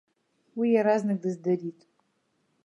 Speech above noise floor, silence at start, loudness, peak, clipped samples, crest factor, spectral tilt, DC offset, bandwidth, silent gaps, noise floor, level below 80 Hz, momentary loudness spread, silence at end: 47 dB; 0.55 s; -26 LUFS; -12 dBFS; under 0.1%; 18 dB; -8 dB/octave; under 0.1%; 10.5 kHz; none; -73 dBFS; -82 dBFS; 13 LU; 0.95 s